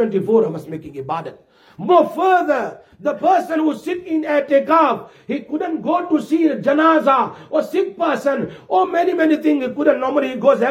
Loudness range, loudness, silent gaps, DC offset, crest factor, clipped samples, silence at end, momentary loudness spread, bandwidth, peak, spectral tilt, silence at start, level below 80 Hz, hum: 2 LU; -18 LUFS; none; under 0.1%; 16 dB; under 0.1%; 0 s; 11 LU; 14.5 kHz; -2 dBFS; -6.5 dB/octave; 0 s; -66 dBFS; none